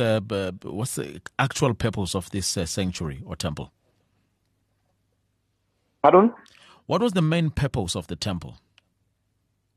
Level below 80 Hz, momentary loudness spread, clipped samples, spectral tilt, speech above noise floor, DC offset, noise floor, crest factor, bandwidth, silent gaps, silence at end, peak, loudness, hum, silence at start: -48 dBFS; 14 LU; under 0.1%; -5.5 dB/octave; 48 dB; under 0.1%; -72 dBFS; 22 dB; 13 kHz; none; 1.2 s; -4 dBFS; -25 LUFS; 50 Hz at -55 dBFS; 0 s